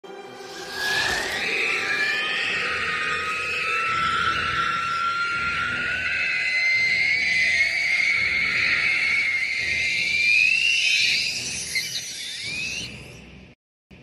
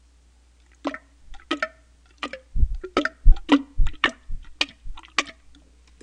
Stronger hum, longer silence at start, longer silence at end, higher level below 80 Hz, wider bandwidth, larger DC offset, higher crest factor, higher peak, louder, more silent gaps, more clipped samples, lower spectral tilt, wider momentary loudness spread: neither; second, 0.05 s vs 0.85 s; second, 0 s vs 0.7 s; second, -54 dBFS vs -26 dBFS; first, 15 kHz vs 8.6 kHz; neither; second, 16 dB vs 24 dB; second, -8 dBFS vs 0 dBFS; first, -21 LUFS vs -26 LUFS; first, 13.55-13.90 s vs none; neither; second, -0.5 dB/octave vs -4.5 dB/octave; second, 10 LU vs 16 LU